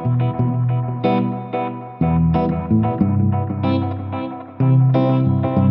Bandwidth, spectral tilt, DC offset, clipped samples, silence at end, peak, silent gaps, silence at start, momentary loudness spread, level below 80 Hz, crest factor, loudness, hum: 5 kHz; -12.5 dB/octave; under 0.1%; under 0.1%; 0 s; -4 dBFS; none; 0 s; 9 LU; -40 dBFS; 14 dB; -19 LUFS; none